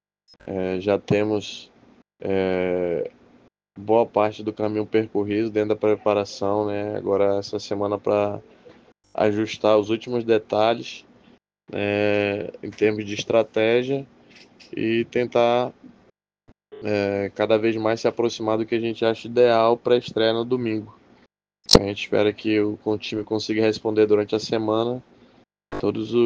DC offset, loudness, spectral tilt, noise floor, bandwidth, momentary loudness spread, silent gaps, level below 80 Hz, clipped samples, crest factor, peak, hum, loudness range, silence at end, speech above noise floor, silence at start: under 0.1%; -22 LUFS; -5.5 dB/octave; -60 dBFS; 9.6 kHz; 10 LU; none; -48 dBFS; under 0.1%; 22 dB; 0 dBFS; none; 4 LU; 0 s; 38 dB; 0.45 s